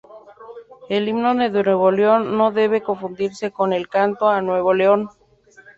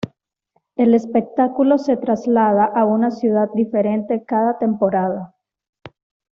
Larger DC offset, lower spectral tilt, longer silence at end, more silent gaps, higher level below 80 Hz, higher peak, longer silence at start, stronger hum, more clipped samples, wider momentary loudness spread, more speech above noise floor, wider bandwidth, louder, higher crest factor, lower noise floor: neither; about the same, -6.5 dB/octave vs -7.5 dB/octave; first, 0.7 s vs 0.45 s; second, none vs 5.69-5.73 s; about the same, -62 dBFS vs -62 dBFS; about the same, -2 dBFS vs -4 dBFS; about the same, 0.1 s vs 0.05 s; neither; neither; first, 9 LU vs 6 LU; second, 32 dB vs 51 dB; first, 7.8 kHz vs 6.8 kHz; about the same, -19 LUFS vs -18 LUFS; about the same, 16 dB vs 14 dB; second, -50 dBFS vs -68 dBFS